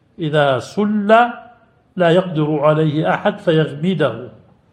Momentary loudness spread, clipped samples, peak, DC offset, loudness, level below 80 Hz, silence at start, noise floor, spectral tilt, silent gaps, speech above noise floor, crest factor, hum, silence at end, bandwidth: 7 LU; under 0.1%; 0 dBFS; under 0.1%; -16 LUFS; -60 dBFS; 0.2 s; -48 dBFS; -7.5 dB/octave; none; 32 dB; 16 dB; none; 0.4 s; 9.6 kHz